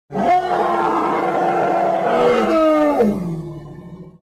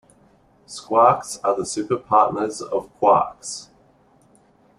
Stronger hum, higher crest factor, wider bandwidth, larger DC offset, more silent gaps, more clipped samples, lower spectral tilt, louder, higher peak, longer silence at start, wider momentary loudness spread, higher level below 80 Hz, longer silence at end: neither; second, 10 dB vs 20 dB; first, 14.5 kHz vs 12.5 kHz; neither; neither; neither; first, -7 dB/octave vs -4.5 dB/octave; first, -17 LUFS vs -20 LUFS; second, -6 dBFS vs -2 dBFS; second, 0.1 s vs 0.7 s; about the same, 15 LU vs 16 LU; first, -48 dBFS vs -60 dBFS; second, 0.15 s vs 1.15 s